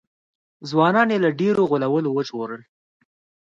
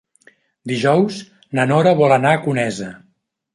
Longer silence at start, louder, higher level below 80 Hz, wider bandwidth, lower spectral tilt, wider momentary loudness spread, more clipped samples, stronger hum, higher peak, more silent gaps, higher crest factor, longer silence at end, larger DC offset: about the same, 0.6 s vs 0.65 s; second, -20 LUFS vs -16 LUFS; second, -68 dBFS vs -60 dBFS; second, 7.6 kHz vs 11.5 kHz; about the same, -7 dB/octave vs -6.5 dB/octave; about the same, 15 LU vs 17 LU; neither; neither; about the same, -4 dBFS vs -2 dBFS; neither; about the same, 18 dB vs 16 dB; first, 0.8 s vs 0.6 s; neither